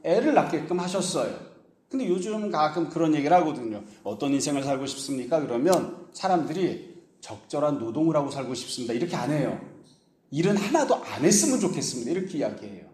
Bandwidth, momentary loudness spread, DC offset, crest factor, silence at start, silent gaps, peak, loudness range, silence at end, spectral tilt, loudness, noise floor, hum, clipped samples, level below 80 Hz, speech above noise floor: 15.5 kHz; 13 LU; under 0.1%; 20 dB; 0.05 s; none; -6 dBFS; 3 LU; 0.05 s; -4.5 dB/octave; -26 LUFS; -58 dBFS; none; under 0.1%; -68 dBFS; 32 dB